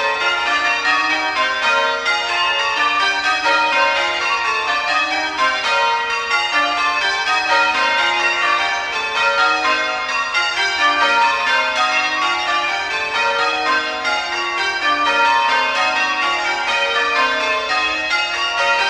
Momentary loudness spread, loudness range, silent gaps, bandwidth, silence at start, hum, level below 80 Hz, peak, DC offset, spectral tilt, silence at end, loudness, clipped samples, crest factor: 4 LU; 1 LU; none; 13.5 kHz; 0 s; none; -54 dBFS; -2 dBFS; under 0.1%; -0.5 dB/octave; 0 s; -16 LUFS; under 0.1%; 14 dB